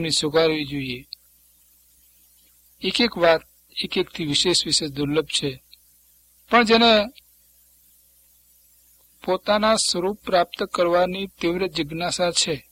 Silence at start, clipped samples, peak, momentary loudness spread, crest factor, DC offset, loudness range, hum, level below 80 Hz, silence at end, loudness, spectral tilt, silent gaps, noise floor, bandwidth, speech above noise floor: 0 s; under 0.1%; -2 dBFS; 13 LU; 20 dB; under 0.1%; 5 LU; 60 Hz at -50 dBFS; -54 dBFS; 0.1 s; -21 LUFS; -3 dB/octave; none; -57 dBFS; 16.5 kHz; 36 dB